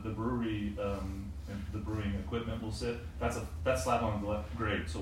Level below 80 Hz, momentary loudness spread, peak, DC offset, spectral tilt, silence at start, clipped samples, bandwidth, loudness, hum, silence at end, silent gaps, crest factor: -46 dBFS; 8 LU; -18 dBFS; under 0.1%; -6 dB/octave; 0 s; under 0.1%; 16 kHz; -36 LUFS; none; 0 s; none; 18 dB